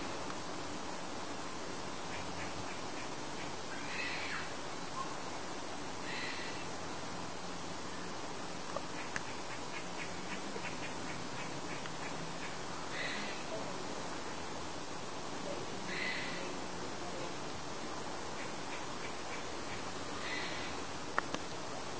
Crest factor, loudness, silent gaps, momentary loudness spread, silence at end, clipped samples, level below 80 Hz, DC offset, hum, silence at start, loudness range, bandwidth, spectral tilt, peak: 30 dB; -41 LUFS; none; 5 LU; 0 s; under 0.1%; -64 dBFS; 0.6%; none; 0 s; 2 LU; 8 kHz; -3 dB/octave; -12 dBFS